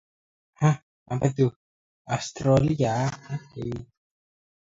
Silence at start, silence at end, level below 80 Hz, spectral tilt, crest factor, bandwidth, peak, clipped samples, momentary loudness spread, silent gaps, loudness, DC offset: 0.6 s; 0.85 s; -52 dBFS; -7 dB/octave; 20 dB; 7.8 kHz; -8 dBFS; under 0.1%; 13 LU; 0.83-1.06 s, 1.56-2.05 s; -26 LUFS; under 0.1%